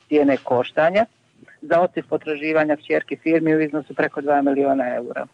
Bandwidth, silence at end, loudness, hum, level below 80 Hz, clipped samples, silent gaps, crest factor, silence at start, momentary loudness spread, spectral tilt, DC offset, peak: 8 kHz; 0.1 s; -20 LUFS; none; -66 dBFS; under 0.1%; none; 12 dB; 0.1 s; 6 LU; -7.5 dB/octave; under 0.1%; -8 dBFS